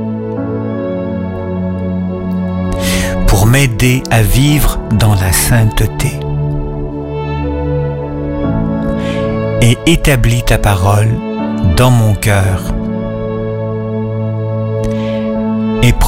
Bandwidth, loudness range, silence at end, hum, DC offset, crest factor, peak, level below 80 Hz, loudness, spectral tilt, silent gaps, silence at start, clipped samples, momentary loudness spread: 16.5 kHz; 6 LU; 0 s; none; under 0.1%; 12 dB; 0 dBFS; -20 dBFS; -13 LUFS; -5.5 dB/octave; none; 0 s; under 0.1%; 9 LU